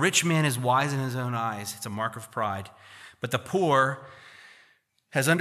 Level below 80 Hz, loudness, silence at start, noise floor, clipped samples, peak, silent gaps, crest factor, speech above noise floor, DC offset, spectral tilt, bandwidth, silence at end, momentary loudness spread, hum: -72 dBFS; -27 LUFS; 0 s; -64 dBFS; under 0.1%; -8 dBFS; none; 20 dB; 38 dB; under 0.1%; -4 dB/octave; 15 kHz; 0 s; 20 LU; none